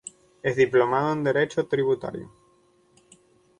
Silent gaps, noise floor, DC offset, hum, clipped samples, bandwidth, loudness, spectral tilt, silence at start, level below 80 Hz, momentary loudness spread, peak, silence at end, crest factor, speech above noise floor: none; -62 dBFS; under 0.1%; none; under 0.1%; 10 kHz; -24 LUFS; -6 dB/octave; 0.45 s; -64 dBFS; 15 LU; -8 dBFS; 1.3 s; 18 dB; 38 dB